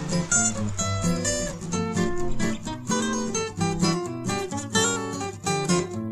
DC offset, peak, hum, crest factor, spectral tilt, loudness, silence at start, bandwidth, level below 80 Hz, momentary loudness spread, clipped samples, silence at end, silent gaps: under 0.1%; -8 dBFS; none; 16 dB; -4 dB/octave; -25 LUFS; 0 s; 14 kHz; -40 dBFS; 7 LU; under 0.1%; 0 s; none